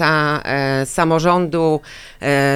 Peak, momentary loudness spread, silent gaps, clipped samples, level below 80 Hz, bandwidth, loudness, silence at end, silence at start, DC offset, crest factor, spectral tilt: -2 dBFS; 8 LU; none; under 0.1%; -44 dBFS; 16 kHz; -17 LUFS; 0 s; 0 s; under 0.1%; 14 dB; -5.5 dB/octave